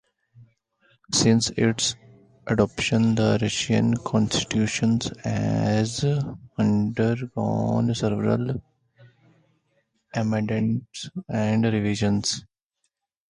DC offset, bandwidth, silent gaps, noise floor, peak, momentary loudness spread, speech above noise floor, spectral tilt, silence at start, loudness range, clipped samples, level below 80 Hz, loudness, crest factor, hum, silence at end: under 0.1%; 11 kHz; none; -77 dBFS; -6 dBFS; 9 LU; 54 dB; -5 dB/octave; 0.4 s; 5 LU; under 0.1%; -52 dBFS; -24 LUFS; 18 dB; none; 0.9 s